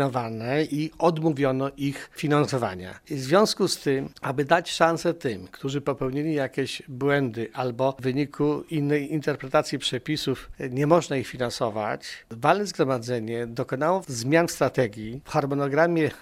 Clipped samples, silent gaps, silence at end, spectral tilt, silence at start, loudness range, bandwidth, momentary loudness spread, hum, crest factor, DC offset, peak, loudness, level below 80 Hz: under 0.1%; none; 0 s; -5.5 dB/octave; 0 s; 2 LU; 16 kHz; 9 LU; none; 22 dB; under 0.1%; -4 dBFS; -25 LUFS; -56 dBFS